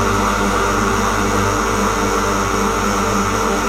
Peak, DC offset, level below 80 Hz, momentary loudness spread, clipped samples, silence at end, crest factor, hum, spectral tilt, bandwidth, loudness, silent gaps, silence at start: -4 dBFS; under 0.1%; -28 dBFS; 1 LU; under 0.1%; 0 s; 12 dB; 50 Hz at -25 dBFS; -4 dB/octave; 16.5 kHz; -16 LUFS; none; 0 s